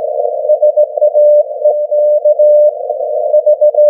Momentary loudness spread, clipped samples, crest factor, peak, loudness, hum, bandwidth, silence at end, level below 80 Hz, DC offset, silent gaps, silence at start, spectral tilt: 8 LU; under 0.1%; 8 dB; -2 dBFS; -10 LUFS; none; 0.9 kHz; 0 s; -88 dBFS; under 0.1%; none; 0 s; -8.5 dB/octave